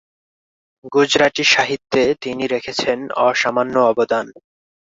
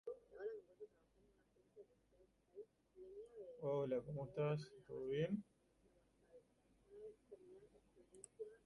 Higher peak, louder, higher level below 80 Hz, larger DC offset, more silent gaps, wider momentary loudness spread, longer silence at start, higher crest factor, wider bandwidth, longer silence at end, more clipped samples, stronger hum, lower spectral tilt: first, 0 dBFS vs -30 dBFS; first, -17 LUFS vs -47 LUFS; first, -56 dBFS vs -80 dBFS; neither; neither; second, 8 LU vs 23 LU; first, 0.85 s vs 0.05 s; about the same, 18 dB vs 20 dB; second, 7.8 kHz vs 11 kHz; first, 0.55 s vs 0.1 s; neither; neither; second, -3 dB/octave vs -7.5 dB/octave